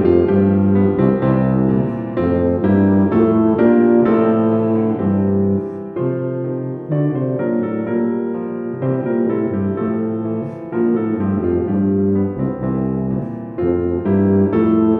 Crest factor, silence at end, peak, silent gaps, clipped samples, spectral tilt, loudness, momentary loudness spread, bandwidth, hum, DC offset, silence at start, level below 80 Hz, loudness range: 16 dB; 0 s; 0 dBFS; none; under 0.1%; -12 dB/octave; -17 LUFS; 8 LU; 3.8 kHz; none; under 0.1%; 0 s; -44 dBFS; 5 LU